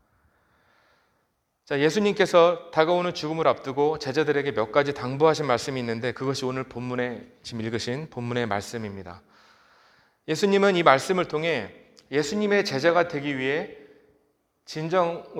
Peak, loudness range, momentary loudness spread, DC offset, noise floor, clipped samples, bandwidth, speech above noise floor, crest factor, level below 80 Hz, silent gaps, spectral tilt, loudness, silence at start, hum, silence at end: -2 dBFS; 8 LU; 14 LU; under 0.1%; -73 dBFS; under 0.1%; 14.5 kHz; 49 dB; 24 dB; -64 dBFS; none; -5 dB/octave; -24 LUFS; 1.7 s; none; 0 s